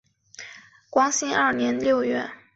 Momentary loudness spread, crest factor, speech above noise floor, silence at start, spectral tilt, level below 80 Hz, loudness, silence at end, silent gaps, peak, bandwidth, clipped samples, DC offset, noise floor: 19 LU; 18 dB; 24 dB; 0.4 s; -2.5 dB/octave; -64 dBFS; -23 LUFS; 0.2 s; none; -8 dBFS; 8.2 kHz; under 0.1%; under 0.1%; -46 dBFS